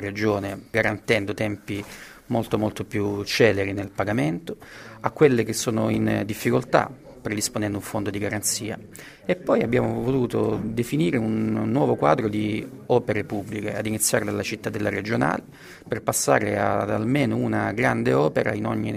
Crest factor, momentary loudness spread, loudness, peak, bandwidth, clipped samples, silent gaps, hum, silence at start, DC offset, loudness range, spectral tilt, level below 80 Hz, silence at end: 22 dB; 11 LU; -24 LUFS; -2 dBFS; 16 kHz; under 0.1%; none; none; 0 s; under 0.1%; 3 LU; -5 dB/octave; -52 dBFS; 0 s